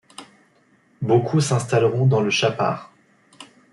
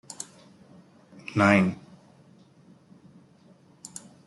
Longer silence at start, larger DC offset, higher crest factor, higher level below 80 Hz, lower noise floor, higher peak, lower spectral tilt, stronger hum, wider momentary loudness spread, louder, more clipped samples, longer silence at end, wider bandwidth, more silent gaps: about the same, 0.2 s vs 0.2 s; neither; second, 18 dB vs 24 dB; first, -62 dBFS vs -70 dBFS; about the same, -59 dBFS vs -57 dBFS; about the same, -4 dBFS vs -6 dBFS; about the same, -5.5 dB/octave vs -6 dB/octave; neither; second, 12 LU vs 24 LU; first, -20 LUFS vs -23 LUFS; neither; second, 0.3 s vs 2.5 s; about the same, 12 kHz vs 12 kHz; neither